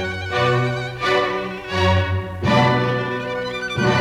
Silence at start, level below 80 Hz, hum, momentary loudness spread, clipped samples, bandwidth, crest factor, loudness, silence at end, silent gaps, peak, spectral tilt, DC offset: 0 s; -44 dBFS; none; 8 LU; under 0.1%; 12 kHz; 16 dB; -20 LUFS; 0 s; none; -2 dBFS; -6 dB/octave; under 0.1%